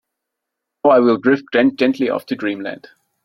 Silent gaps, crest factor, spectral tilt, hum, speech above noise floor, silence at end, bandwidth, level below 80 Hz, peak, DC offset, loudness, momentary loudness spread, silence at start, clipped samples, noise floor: none; 16 dB; -7 dB/octave; none; 64 dB; 0.5 s; 12 kHz; -64 dBFS; -2 dBFS; under 0.1%; -16 LUFS; 13 LU; 0.85 s; under 0.1%; -80 dBFS